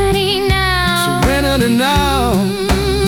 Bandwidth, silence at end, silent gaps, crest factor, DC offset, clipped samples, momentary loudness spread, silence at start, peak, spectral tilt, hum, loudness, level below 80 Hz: 18 kHz; 0 s; none; 12 dB; under 0.1%; under 0.1%; 3 LU; 0 s; -2 dBFS; -4.5 dB/octave; none; -14 LUFS; -24 dBFS